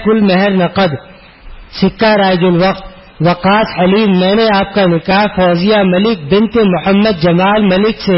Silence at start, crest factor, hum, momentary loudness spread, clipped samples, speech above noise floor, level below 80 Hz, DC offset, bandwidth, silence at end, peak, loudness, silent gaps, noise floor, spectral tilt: 0 s; 10 dB; none; 5 LU; under 0.1%; 23 dB; -38 dBFS; under 0.1%; 5.8 kHz; 0 s; 0 dBFS; -11 LUFS; none; -33 dBFS; -11 dB/octave